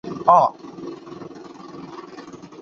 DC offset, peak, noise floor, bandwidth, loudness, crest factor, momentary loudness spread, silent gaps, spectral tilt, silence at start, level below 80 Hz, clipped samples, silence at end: under 0.1%; 0 dBFS; -39 dBFS; 7.2 kHz; -17 LUFS; 22 dB; 24 LU; none; -6.5 dB/octave; 0.05 s; -64 dBFS; under 0.1%; 0.15 s